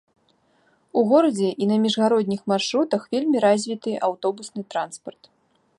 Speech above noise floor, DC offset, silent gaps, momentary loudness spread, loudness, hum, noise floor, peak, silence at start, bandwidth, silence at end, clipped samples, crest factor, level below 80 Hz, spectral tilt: 42 dB; under 0.1%; none; 11 LU; -22 LUFS; none; -63 dBFS; -6 dBFS; 0.95 s; 11.5 kHz; 0.7 s; under 0.1%; 18 dB; -72 dBFS; -5 dB/octave